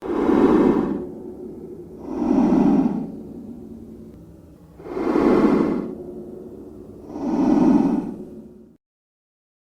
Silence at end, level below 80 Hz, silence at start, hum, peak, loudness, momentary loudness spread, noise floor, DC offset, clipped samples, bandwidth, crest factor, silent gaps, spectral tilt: 1 s; -48 dBFS; 0 s; none; -4 dBFS; -19 LUFS; 23 LU; -45 dBFS; under 0.1%; under 0.1%; 8.8 kHz; 18 dB; none; -8.5 dB/octave